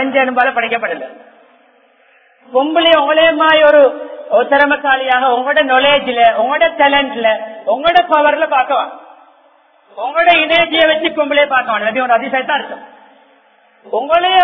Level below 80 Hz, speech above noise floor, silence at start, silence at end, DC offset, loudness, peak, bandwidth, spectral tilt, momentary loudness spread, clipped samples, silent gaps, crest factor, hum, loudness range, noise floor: -54 dBFS; 38 dB; 0 s; 0 s; under 0.1%; -12 LUFS; 0 dBFS; 6 kHz; -5.5 dB/octave; 10 LU; under 0.1%; none; 14 dB; none; 4 LU; -50 dBFS